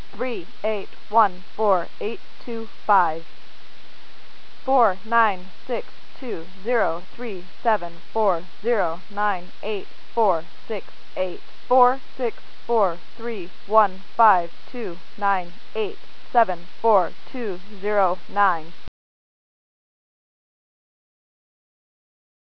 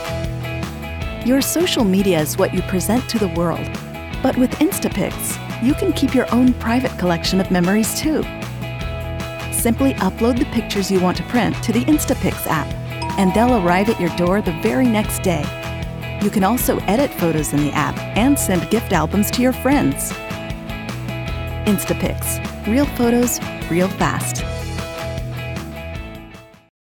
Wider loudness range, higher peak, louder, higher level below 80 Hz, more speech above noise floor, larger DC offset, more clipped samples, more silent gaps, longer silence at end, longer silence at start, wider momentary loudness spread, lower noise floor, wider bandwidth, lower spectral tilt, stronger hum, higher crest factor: about the same, 4 LU vs 3 LU; about the same, -2 dBFS vs -2 dBFS; second, -23 LUFS vs -19 LUFS; second, -66 dBFS vs -34 dBFS; about the same, 26 dB vs 23 dB; first, 7% vs under 0.1%; neither; neither; first, 3.8 s vs 0.4 s; first, 0.15 s vs 0 s; about the same, 13 LU vs 11 LU; first, -49 dBFS vs -40 dBFS; second, 5.4 kHz vs over 20 kHz; first, -6.5 dB/octave vs -5 dB/octave; neither; about the same, 22 dB vs 18 dB